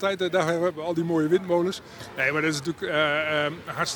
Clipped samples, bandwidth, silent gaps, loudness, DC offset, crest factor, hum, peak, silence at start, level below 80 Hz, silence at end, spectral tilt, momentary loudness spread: under 0.1%; 19.5 kHz; none; -25 LUFS; under 0.1%; 16 dB; none; -10 dBFS; 0 s; -62 dBFS; 0 s; -4.5 dB/octave; 6 LU